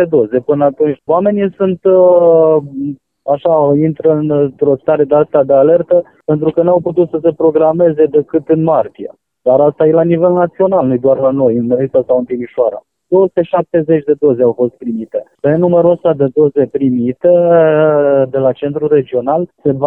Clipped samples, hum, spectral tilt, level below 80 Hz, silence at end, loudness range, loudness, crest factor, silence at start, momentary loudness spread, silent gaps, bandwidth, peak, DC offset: under 0.1%; none; -11.5 dB/octave; -54 dBFS; 0 s; 2 LU; -12 LUFS; 12 dB; 0 s; 8 LU; none; 3.6 kHz; 0 dBFS; 0.1%